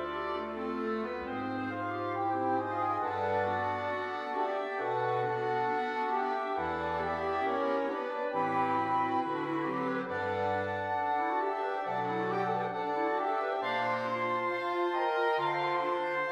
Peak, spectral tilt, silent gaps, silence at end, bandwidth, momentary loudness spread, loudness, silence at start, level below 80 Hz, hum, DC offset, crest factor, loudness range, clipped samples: -18 dBFS; -6.5 dB/octave; none; 0 s; 11 kHz; 5 LU; -32 LUFS; 0 s; -66 dBFS; none; under 0.1%; 14 dB; 2 LU; under 0.1%